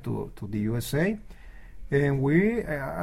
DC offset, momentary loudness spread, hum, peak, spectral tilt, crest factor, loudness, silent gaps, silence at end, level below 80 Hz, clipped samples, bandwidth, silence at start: under 0.1%; 11 LU; none; -10 dBFS; -7 dB/octave; 18 dB; -27 LUFS; none; 0 s; -46 dBFS; under 0.1%; 16 kHz; 0 s